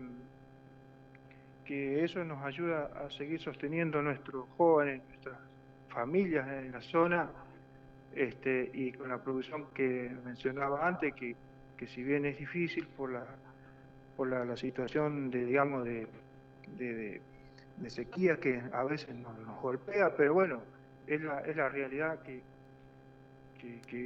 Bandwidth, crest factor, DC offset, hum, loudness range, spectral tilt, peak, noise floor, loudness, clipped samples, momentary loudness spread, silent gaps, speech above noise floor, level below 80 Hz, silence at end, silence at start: 7.6 kHz; 20 dB; under 0.1%; none; 5 LU; -8 dB/octave; -16 dBFS; -57 dBFS; -35 LUFS; under 0.1%; 19 LU; none; 22 dB; -66 dBFS; 0 s; 0 s